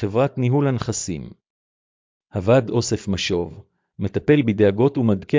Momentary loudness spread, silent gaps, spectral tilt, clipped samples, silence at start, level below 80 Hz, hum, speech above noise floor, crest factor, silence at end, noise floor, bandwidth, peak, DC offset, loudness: 13 LU; 1.50-2.21 s; -6 dB/octave; under 0.1%; 0 s; -46 dBFS; none; over 70 dB; 18 dB; 0 s; under -90 dBFS; 7.6 kHz; -4 dBFS; under 0.1%; -20 LUFS